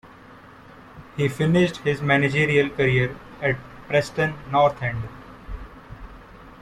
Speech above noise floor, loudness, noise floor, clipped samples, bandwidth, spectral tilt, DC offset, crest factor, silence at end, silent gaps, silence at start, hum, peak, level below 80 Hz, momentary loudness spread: 25 dB; -22 LUFS; -46 dBFS; under 0.1%; 13.5 kHz; -6.5 dB/octave; under 0.1%; 18 dB; 0.05 s; none; 0.05 s; none; -6 dBFS; -46 dBFS; 20 LU